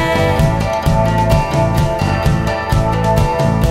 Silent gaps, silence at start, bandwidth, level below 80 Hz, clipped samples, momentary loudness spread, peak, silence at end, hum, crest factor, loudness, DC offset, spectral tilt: none; 0 s; 16 kHz; -22 dBFS; under 0.1%; 2 LU; -2 dBFS; 0 s; none; 12 dB; -15 LUFS; under 0.1%; -6.5 dB/octave